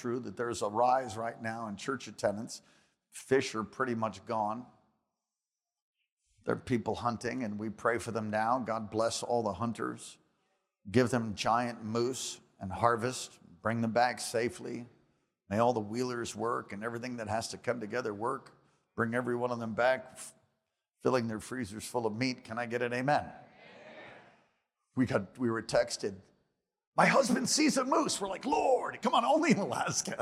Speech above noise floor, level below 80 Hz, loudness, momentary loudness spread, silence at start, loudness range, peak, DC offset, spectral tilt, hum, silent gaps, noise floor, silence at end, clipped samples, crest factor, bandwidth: over 58 dB; -70 dBFS; -32 LUFS; 13 LU; 0 s; 7 LU; -10 dBFS; under 0.1%; -4.5 dB/octave; none; 5.82-5.93 s, 6.12-6.17 s, 26.87-26.92 s; under -90 dBFS; 0 s; under 0.1%; 24 dB; 15.5 kHz